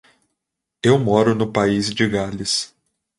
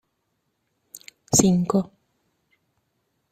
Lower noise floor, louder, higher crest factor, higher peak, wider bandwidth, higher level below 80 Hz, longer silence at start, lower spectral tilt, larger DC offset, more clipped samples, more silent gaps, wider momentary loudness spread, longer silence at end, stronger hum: first, -80 dBFS vs -74 dBFS; about the same, -19 LUFS vs -20 LUFS; second, 18 dB vs 24 dB; about the same, -2 dBFS vs -2 dBFS; second, 11.5 kHz vs 15 kHz; first, -50 dBFS vs -56 dBFS; about the same, 0.85 s vs 0.95 s; about the same, -5 dB/octave vs -5 dB/octave; neither; neither; neither; second, 7 LU vs 26 LU; second, 0.55 s vs 1.5 s; neither